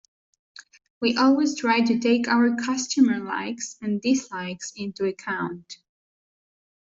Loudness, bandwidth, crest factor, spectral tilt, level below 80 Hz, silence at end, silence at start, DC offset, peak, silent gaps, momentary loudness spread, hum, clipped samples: -24 LUFS; 7.8 kHz; 18 dB; -4 dB/octave; -68 dBFS; 1.05 s; 1 s; under 0.1%; -6 dBFS; none; 13 LU; none; under 0.1%